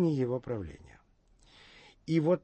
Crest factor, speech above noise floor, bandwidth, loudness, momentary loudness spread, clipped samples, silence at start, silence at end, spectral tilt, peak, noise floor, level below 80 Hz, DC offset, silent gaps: 16 dB; 34 dB; 8.6 kHz; -32 LUFS; 25 LU; under 0.1%; 0 s; 0.05 s; -8.5 dB/octave; -16 dBFS; -64 dBFS; -60 dBFS; under 0.1%; none